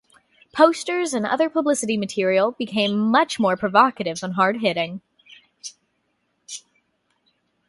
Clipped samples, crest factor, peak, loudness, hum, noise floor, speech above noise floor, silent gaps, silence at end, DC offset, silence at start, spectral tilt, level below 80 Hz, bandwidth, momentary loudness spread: under 0.1%; 22 dB; 0 dBFS; -20 LUFS; none; -71 dBFS; 51 dB; none; 1.1 s; under 0.1%; 0.55 s; -4 dB/octave; -66 dBFS; 11.5 kHz; 19 LU